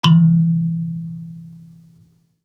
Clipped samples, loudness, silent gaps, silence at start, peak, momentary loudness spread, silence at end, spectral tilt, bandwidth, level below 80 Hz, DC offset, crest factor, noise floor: under 0.1%; -17 LUFS; none; 0.05 s; -2 dBFS; 23 LU; 0.95 s; -7 dB/octave; 6.6 kHz; -60 dBFS; under 0.1%; 16 dB; -54 dBFS